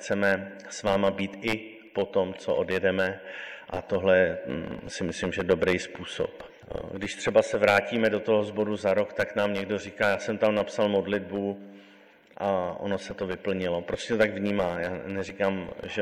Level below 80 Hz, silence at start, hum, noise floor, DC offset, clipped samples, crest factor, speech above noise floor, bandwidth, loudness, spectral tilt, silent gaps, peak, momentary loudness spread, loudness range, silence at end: -54 dBFS; 0 s; none; -55 dBFS; under 0.1%; under 0.1%; 20 dB; 28 dB; 16 kHz; -28 LUFS; -5 dB/octave; none; -8 dBFS; 11 LU; 4 LU; 0 s